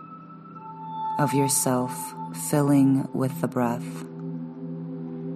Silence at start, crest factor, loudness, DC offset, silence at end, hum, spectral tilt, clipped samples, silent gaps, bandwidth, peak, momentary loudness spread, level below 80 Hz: 0 s; 18 dB; -26 LUFS; under 0.1%; 0 s; none; -5.5 dB/octave; under 0.1%; none; 15 kHz; -8 dBFS; 19 LU; -68 dBFS